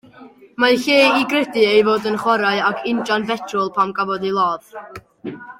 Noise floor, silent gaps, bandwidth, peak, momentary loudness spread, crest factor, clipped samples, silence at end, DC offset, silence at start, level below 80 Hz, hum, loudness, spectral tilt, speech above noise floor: -44 dBFS; none; 16.5 kHz; -2 dBFS; 20 LU; 16 dB; under 0.1%; 0.05 s; under 0.1%; 0.2 s; -62 dBFS; none; -17 LUFS; -4.5 dB/octave; 26 dB